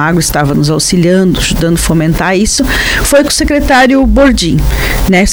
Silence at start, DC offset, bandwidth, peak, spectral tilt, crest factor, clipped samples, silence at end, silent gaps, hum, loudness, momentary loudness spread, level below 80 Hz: 0 s; under 0.1%; over 20 kHz; 0 dBFS; -4.5 dB/octave; 8 dB; under 0.1%; 0 s; none; none; -9 LUFS; 4 LU; -18 dBFS